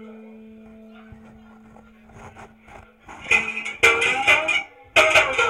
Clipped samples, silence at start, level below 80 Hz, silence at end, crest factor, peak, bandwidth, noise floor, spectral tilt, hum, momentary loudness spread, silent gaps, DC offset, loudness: under 0.1%; 0 s; -54 dBFS; 0 s; 20 dB; -4 dBFS; 16.5 kHz; -48 dBFS; -1.5 dB/octave; none; 9 LU; none; under 0.1%; -17 LUFS